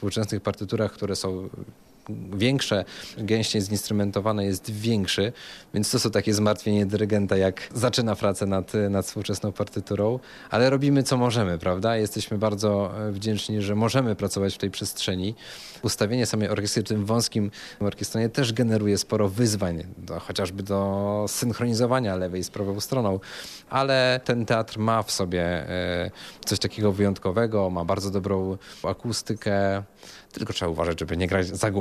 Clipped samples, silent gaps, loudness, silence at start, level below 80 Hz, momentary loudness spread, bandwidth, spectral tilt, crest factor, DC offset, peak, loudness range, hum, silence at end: under 0.1%; none; -25 LUFS; 0 s; -56 dBFS; 9 LU; 15 kHz; -5 dB/octave; 16 dB; under 0.1%; -8 dBFS; 3 LU; none; 0 s